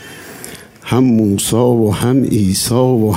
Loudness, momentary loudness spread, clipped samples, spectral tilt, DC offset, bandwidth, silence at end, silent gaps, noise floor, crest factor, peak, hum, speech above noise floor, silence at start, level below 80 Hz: -13 LUFS; 18 LU; under 0.1%; -6 dB/octave; under 0.1%; 16.5 kHz; 0 s; none; -33 dBFS; 12 dB; 0 dBFS; none; 21 dB; 0 s; -42 dBFS